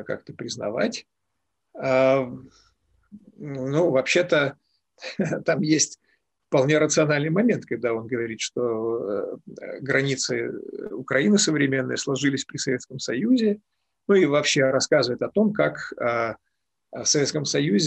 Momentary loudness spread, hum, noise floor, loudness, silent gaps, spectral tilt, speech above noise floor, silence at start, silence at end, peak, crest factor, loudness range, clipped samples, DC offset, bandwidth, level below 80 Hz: 15 LU; none; -80 dBFS; -23 LUFS; none; -4 dB/octave; 57 dB; 0 s; 0 s; -8 dBFS; 16 dB; 4 LU; under 0.1%; under 0.1%; 9.4 kHz; -66 dBFS